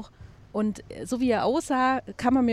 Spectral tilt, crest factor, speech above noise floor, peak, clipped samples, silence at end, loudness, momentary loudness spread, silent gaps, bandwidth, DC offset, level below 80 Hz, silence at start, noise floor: -5.5 dB/octave; 16 dB; 24 dB; -10 dBFS; under 0.1%; 0 s; -26 LUFS; 11 LU; none; 13 kHz; under 0.1%; -52 dBFS; 0 s; -48 dBFS